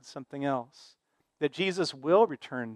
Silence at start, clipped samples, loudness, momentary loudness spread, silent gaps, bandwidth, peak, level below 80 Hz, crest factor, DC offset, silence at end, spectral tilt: 0.05 s; under 0.1%; -29 LUFS; 13 LU; none; 11 kHz; -10 dBFS; -82 dBFS; 20 dB; under 0.1%; 0 s; -5 dB/octave